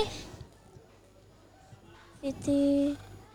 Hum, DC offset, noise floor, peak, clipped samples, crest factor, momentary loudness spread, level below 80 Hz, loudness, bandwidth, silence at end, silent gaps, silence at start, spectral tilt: none; under 0.1%; -58 dBFS; -16 dBFS; under 0.1%; 18 dB; 25 LU; -56 dBFS; -30 LUFS; 11 kHz; 0.1 s; none; 0 s; -6 dB/octave